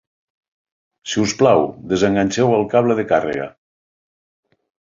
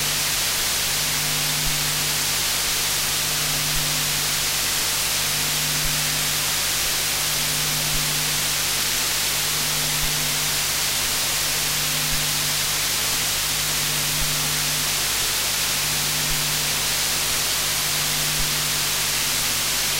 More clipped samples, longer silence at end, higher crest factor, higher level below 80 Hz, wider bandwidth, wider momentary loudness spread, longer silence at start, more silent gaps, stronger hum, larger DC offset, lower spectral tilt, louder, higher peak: neither; first, 1.45 s vs 0 s; about the same, 18 dB vs 14 dB; second, -52 dBFS vs -40 dBFS; second, 7.6 kHz vs 16 kHz; first, 11 LU vs 0 LU; first, 1.05 s vs 0 s; neither; second, none vs 50 Hz at -40 dBFS; neither; first, -5.5 dB/octave vs -0.5 dB/octave; first, -17 LUFS vs -20 LUFS; first, -2 dBFS vs -8 dBFS